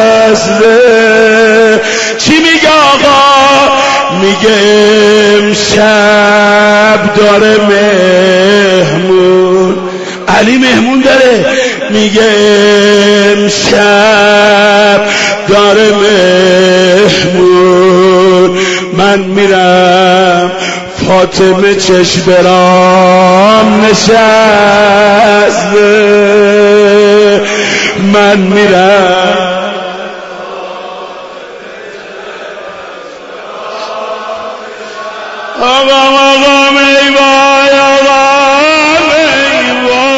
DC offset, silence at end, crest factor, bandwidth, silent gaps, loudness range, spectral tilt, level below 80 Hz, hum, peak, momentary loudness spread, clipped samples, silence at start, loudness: under 0.1%; 0 s; 6 dB; 12 kHz; none; 10 LU; -4 dB/octave; -42 dBFS; none; 0 dBFS; 16 LU; 2%; 0 s; -5 LUFS